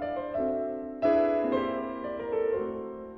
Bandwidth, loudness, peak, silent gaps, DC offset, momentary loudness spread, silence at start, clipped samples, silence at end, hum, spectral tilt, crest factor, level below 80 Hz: 6 kHz; -30 LUFS; -14 dBFS; none; under 0.1%; 10 LU; 0 s; under 0.1%; 0 s; none; -8.5 dB/octave; 16 dB; -58 dBFS